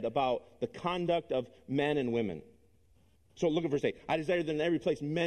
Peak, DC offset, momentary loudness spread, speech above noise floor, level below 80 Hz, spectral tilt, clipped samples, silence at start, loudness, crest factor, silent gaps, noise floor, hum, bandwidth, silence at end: -16 dBFS; under 0.1%; 6 LU; 35 dB; -64 dBFS; -6.5 dB/octave; under 0.1%; 0 s; -33 LUFS; 16 dB; none; -67 dBFS; none; 10 kHz; 0 s